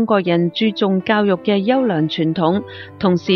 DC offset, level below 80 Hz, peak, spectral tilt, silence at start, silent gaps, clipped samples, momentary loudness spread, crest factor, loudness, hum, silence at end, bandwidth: under 0.1%; -56 dBFS; -2 dBFS; -8 dB/octave; 0 s; none; under 0.1%; 3 LU; 14 dB; -17 LUFS; none; 0 s; 6.4 kHz